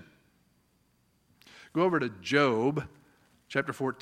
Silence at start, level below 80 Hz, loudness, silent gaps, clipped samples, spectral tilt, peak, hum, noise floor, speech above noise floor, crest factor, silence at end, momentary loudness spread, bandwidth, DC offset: 1.75 s; -68 dBFS; -29 LUFS; none; under 0.1%; -6 dB/octave; -8 dBFS; none; -70 dBFS; 41 dB; 22 dB; 0.05 s; 11 LU; 15 kHz; under 0.1%